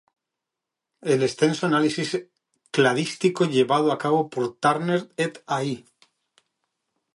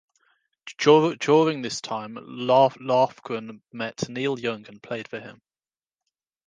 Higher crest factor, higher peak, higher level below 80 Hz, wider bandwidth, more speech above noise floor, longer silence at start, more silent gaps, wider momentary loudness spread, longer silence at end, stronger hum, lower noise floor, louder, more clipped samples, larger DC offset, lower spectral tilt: about the same, 20 dB vs 20 dB; about the same, -6 dBFS vs -4 dBFS; about the same, -72 dBFS vs -72 dBFS; first, 11.5 kHz vs 9.4 kHz; second, 63 dB vs over 67 dB; first, 1.05 s vs 0.65 s; neither; second, 8 LU vs 19 LU; first, 1.35 s vs 1.15 s; neither; second, -85 dBFS vs under -90 dBFS; about the same, -23 LUFS vs -23 LUFS; neither; neither; about the same, -5 dB/octave vs -5 dB/octave